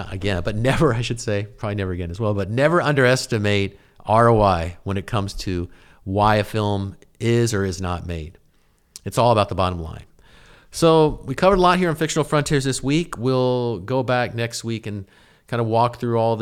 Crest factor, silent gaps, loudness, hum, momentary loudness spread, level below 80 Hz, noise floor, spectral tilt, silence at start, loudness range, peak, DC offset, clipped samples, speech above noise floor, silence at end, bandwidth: 18 dB; none; -20 LUFS; none; 13 LU; -40 dBFS; -59 dBFS; -5.5 dB/octave; 0 s; 4 LU; -4 dBFS; under 0.1%; under 0.1%; 39 dB; 0 s; 15.5 kHz